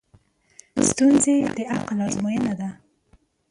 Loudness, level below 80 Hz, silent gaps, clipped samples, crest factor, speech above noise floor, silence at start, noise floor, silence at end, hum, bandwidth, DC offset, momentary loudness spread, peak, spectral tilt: -21 LUFS; -54 dBFS; none; under 0.1%; 16 dB; 39 dB; 0.75 s; -60 dBFS; 0.75 s; none; 11.5 kHz; under 0.1%; 13 LU; -6 dBFS; -4.5 dB/octave